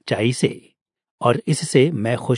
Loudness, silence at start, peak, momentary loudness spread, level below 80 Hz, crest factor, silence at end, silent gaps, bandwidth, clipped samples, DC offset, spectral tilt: -20 LUFS; 0.05 s; -2 dBFS; 6 LU; -66 dBFS; 18 dB; 0 s; 0.81-0.86 s, 1.11-1.18 s; 11 kHz; under 0.1%; under 0.1%; -5.5 dB/octave